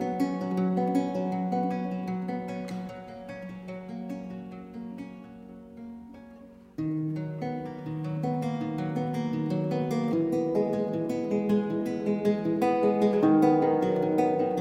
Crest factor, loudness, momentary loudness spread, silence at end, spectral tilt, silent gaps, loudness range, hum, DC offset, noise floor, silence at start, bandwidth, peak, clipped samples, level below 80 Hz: 18 dB; -28 LUFS; 18 LU; 0 s; -8.5 dB/octave; none; 15 LU; none; under 0.1%; -50 dBFS; 0 s; 15.5 kHz; -12 dBFS; under 0.1%; -64 dBFS